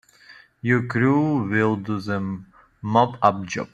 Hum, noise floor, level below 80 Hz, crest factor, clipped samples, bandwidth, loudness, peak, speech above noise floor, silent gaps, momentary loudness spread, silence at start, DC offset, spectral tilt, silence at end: none; -50 dBFS; -60 dBFS; 20 dB; under 0.1%; 9 kHz; -22 LUFS; -2 dBFS; 29 dB; none; 11 LU; 0.3 s; under 0.1%; -7 dB/octave; 0.05 s